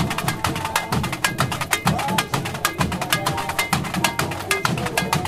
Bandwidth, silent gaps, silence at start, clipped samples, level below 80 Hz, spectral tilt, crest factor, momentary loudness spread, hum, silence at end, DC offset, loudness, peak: 16 kHz; none; 0 s; under 0.1%; -42 dBFS; -3.5 dB/octave; 22 dB; 3 LU; none; 0 s; under 0.1%; -22 LUFS; 0 dBFS